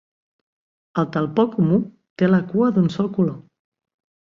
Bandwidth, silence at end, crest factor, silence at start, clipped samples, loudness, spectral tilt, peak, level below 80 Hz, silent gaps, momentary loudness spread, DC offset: 7 kHz; 0.95 s; 18 dB; 0.95 s; under 0.1%; -20 LUFS; -9 dB/octave; -4 dBFS; -60 dBFS; 2.10-2.16 s; 8 LU; under 0.1%